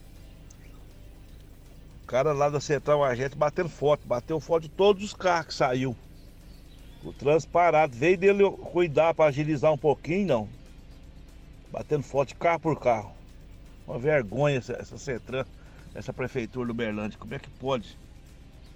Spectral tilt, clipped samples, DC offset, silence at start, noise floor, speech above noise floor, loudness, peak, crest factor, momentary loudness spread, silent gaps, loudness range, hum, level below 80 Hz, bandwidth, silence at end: -6 dB/octave; under 0.1%; under 0.1%; 0 s; -48 dBFS; 22 dB; -26 LUFS; -10 dBFS; 18 dB; 17 LU; none; 8 LU; none; -50 dBFS; 19 kHz; 0 s